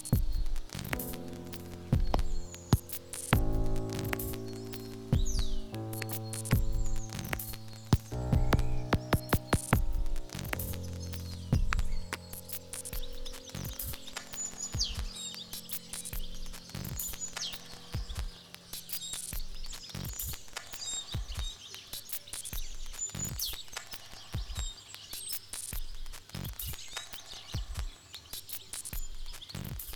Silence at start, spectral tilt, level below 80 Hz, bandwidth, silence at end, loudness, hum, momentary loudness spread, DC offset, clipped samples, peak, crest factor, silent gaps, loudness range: 0 s; -4 dB/octave; -38 dBFS; over 20 kHz; 0 s; -37 LUFS; none; 12 LU; under 0.1%; under 0.1%; -10 dBFS; 24 dB; none; 7 LU